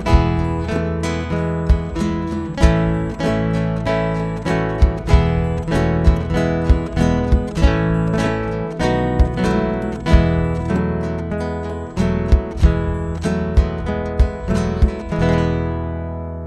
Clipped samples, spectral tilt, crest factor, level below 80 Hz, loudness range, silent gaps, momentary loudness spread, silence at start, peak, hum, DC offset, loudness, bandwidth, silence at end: under 0.1%; -7.5 dB/octave; 18 dB; -22 dBFS; 2 LU; none; 7 LU; 0 s; 0 dBFS; none; under 0.1%; -19 LUFS; 10 kHz; 0 s